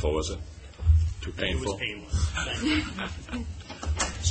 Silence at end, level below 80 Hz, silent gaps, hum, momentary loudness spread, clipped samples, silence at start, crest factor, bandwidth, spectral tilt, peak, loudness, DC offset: 0 s; -32 dBFS; none; none; 11 LU; under 0.1%; 0 s; 18 dB; 8.8 kHz; -4.5 dB/octave; -10 dBFS; -29 LUFS; under 0.1%